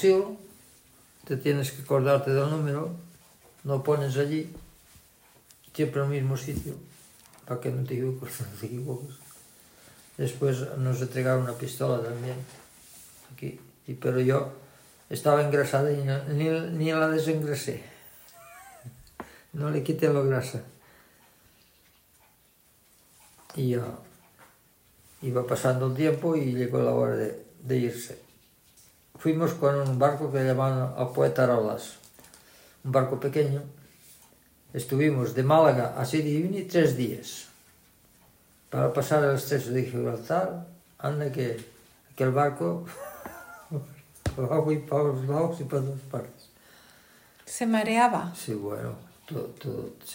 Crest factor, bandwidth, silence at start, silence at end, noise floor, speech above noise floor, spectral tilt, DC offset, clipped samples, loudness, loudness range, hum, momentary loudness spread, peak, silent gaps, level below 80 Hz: 22 dB; 16.5 kHz; 0 s; 0 s; -62 dBFS; 36 dB; -6.5 dB/octave; under 0.1%; under 0.1%; -27 LUFS; 7 LU; none; 19 LU; -8 dBFS; none; -60 dBFS